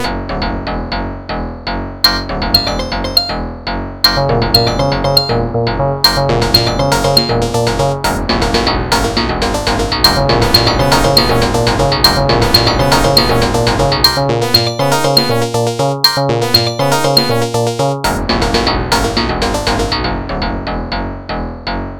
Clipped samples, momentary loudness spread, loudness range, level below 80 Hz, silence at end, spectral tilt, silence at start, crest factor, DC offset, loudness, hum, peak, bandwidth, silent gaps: 0.3%; 11 LU; 5 LU; -24 dBFS; 0 s; -4.5 dB/octave; 0 s; 14 dB; under 0.1%; -12 LUFS; none; 0 dBFS; over 20 kHz; none